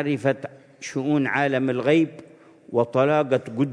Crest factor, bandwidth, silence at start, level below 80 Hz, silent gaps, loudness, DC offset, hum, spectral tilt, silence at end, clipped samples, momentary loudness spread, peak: 16 dB; 10.5 kHz; 0 s; -72 dBFS; none; -23 LUFS; under 0.1%; none; -6.5 dB/octave; 0 s; under 0.1%; 11 LU; -6 dBFS